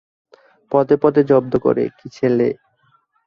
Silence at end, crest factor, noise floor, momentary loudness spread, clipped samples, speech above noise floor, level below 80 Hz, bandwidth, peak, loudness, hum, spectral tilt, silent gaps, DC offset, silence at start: 0.75 s; 16 dB; -60 dBFS; 8 LU; under 0.1%; 44 dB; -56 dBFS; 6.8 kHz; -2 dBFS; -17 LUFS; none; -9 dB/octave; none; under 0.1%; 0.7 s